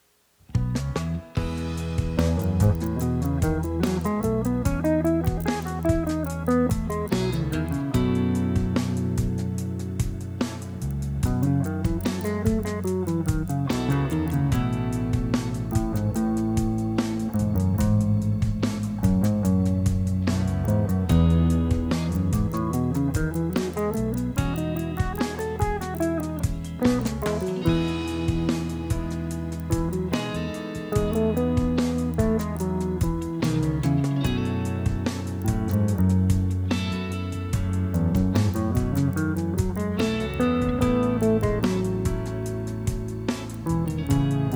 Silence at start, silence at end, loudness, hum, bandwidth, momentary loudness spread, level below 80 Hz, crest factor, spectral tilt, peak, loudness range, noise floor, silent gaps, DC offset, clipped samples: 0.5 s; 0 s; -25 LUFS; none; over 20 kHz; 7 LU; -34 dBFS; 16 dB; -7 dB/octave; -8 dBFS; 3 LU; -57 dBFS; none; under 0.1%; under 0.1%